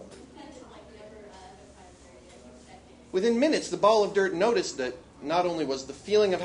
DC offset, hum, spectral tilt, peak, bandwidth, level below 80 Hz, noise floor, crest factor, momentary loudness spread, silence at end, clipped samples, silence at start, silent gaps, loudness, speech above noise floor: under 0.1%; none; -4 dB/octave; -8 dBFS; 10.5 kHz; -60 dBFS; -51 dBFS; 20 dB; 25 LU; 0 s; under 0.1%; 0 s; none; -26 LUFS; 26 dB